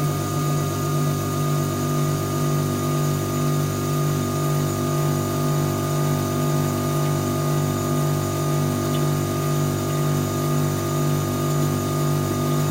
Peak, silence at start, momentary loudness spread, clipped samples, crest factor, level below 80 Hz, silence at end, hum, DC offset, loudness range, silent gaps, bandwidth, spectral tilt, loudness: -10 dBFS; 0 s; 1 LU; under 0.1%; 12 dB; -48 dBFS; 0 s; 50 Hz at -40 dBFS; under 0.1%; 0 LU; none; 16 kHz; -6 dB/octave; -22 LUFS